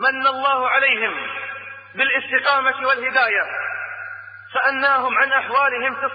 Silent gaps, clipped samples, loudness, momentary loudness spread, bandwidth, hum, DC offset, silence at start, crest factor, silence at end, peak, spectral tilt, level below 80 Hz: none; under 0.1%; -18 LUFS; 14 LU; 5 kHz; none; under 0.1%; 0 s; 16 dB; 0 s; -4 dBFS; -6.5 dB/octave; -74 dBFS